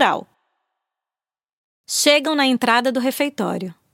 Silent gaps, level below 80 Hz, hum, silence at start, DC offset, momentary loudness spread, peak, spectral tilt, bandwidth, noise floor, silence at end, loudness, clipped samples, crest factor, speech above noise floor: 1.53-1.84 s; -74 dBFS; none; 0 s; under 0.1%; 10 LU; -2 dBFS; -2.5 dB/octave; 16.5 kHz; under -90 dBFS; 0.2 s; -18 LUFS; under 0.1%; 20 dB; over 71 dB